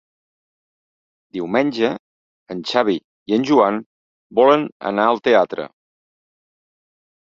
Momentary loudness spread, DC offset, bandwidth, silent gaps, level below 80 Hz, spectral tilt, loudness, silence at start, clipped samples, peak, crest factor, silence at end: 15 LU; under 0.1%; 7.8 kHz; 1.99-2.46 s, 3.04-3.26 s, 3.86-4.30 s, 4.72-4.80 s; -64 dBFS; -6 dB/octave; -18 LUFS; 1.35 s; under 0.1%; -2 dBFS; 20 dB; 1.55 s